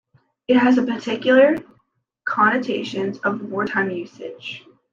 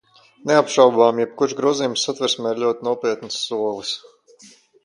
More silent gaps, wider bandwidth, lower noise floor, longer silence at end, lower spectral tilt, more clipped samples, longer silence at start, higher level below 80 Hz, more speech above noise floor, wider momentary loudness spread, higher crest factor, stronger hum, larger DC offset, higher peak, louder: neither; second, 7.4 kHz vs 11 kHz; first, -66 dBFS vs -50 dBFS; second, 0.35 s vs 0.85 s; first, -6 dB/octave vs -3.5 dB/octave; neither; about the same, 0.5 s vs 0.45 s; about the same, -66 dBFS vs -70 dBFS; first, 47 dB vs 31 dB; first, 18 LU vs 11 LU; about the same, 18 dB vs 20 dB; neither; neither; second, -4 dBFS vs 0 dBFS; about the same, -19 LUFS vs -19 LUFS